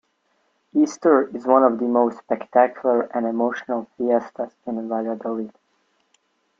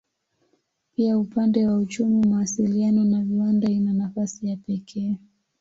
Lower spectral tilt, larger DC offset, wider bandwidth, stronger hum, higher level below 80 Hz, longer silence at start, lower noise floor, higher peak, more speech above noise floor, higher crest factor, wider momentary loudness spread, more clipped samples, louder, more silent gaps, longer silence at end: about the same, -6 dB/octave vs -7 dB/octave; neither; about the same, 7.6 kHz vs 7.8 kHz; neither; second, -72 dBFS vs -62 dBFS; second, 0.75 s vs 1 s; about the same, -68 dBFS vs -71 dBFS; first, -2 dBFS vs -10 dBFS; about the same, 47 dB vs 49 dB; first, 20 dB vs 14 dB; first, 12 LU vs 9 LU; neither; about the same, -21 LUFS vs -23 LUFS; neither; first, 1.1 s vs 0.45 s